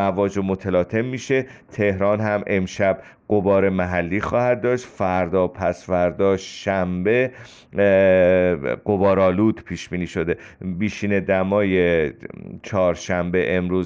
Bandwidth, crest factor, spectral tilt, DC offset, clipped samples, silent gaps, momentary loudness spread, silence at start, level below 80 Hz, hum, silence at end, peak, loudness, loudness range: 7.8 kHz; 14 dB; -7 dB/octave; under 0.1%; under 0.1%; none; 9 LU; 0 s; -50 dBFS; none; 0 s; -6 dBFS; -21 LUFS; 3 LU